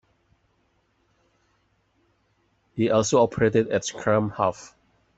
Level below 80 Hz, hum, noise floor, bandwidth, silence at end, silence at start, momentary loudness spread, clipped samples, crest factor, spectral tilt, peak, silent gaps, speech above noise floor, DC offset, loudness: -58 dBFS; none; -68 dBFS; 8.2 kHz; 0.5 s; 2.75 s; 7 LU; under 0.1%; 20 dB; -5 dB/octave; -6 dBFS; none; 46 dB; under 0.1%; -23 LUFS